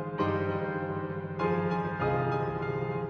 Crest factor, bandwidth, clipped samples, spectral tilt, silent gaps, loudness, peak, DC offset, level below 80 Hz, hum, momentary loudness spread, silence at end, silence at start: 16 dB; 6.4 kHz; under 0.1%; -9 dB/octave; none; -31 LUFS; -16 dBFS; under 0.1%; -56 dBFS; none; 5 LU; 0 s; 0 s